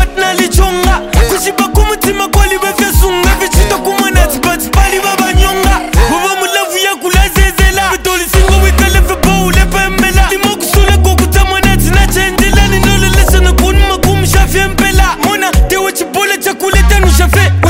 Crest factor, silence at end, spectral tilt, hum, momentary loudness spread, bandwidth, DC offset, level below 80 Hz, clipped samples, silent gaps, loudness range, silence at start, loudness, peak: 8 dB; 0 s; -4 dB/octave; none; 3 LU; 16.5 kHz; under 0.1%; -12 dBFS; 2%; none; 1 LU; 0 s; -9 LUFS; 0 dBFS